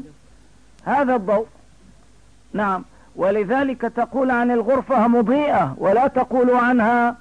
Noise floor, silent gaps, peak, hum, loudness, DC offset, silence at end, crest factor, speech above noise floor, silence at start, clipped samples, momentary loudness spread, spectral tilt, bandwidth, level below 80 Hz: -52 dBFS; none; -8 dBFS; none; -19 LUFS; 0.3%; 0.05 s; 12 dB; 34 dB; 0 s; under 0.1%; 7 LU; -7.5 dB/octave; 9.8 kHz; -54 dBFS